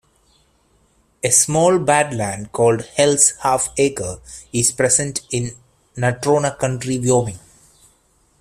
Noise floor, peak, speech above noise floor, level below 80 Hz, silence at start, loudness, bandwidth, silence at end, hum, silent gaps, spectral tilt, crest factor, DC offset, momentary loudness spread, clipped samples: -59 dBFS; 0 dBFS; 41 dB; -50 dBFS; 1.25 s; -17 LUFS; 15.5 kHz; 1.05 s; none; none; -3.5 dB/octave; 18 dB; under 0.1%; 12 LU; under 0.1%